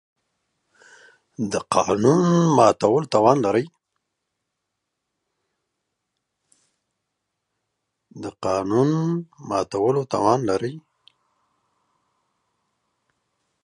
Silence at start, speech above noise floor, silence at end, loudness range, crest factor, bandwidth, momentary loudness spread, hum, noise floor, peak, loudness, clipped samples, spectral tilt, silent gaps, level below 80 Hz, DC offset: 1.4 s; 60 dB; 2.85 s; 11 LU; 22 dB; 11 kHz; 13 LU; none; -80 dBFS; -2 dBFS; -20 LUFS; under 0.1%; -6.5 dB/octave; none; -60 dBFS; under 0.1%